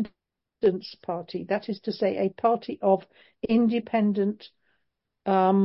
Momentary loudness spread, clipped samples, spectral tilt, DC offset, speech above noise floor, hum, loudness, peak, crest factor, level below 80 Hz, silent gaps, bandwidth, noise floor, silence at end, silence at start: 12 LU; under 0.1%; -10.5 dB/octave; under 0.1%; 54 dB; none; -26 LUFS; -10 dBFS; 16 dB; -66 dBFS; none; 5.8 kHz; -79 dBFS; 0 s; 0 s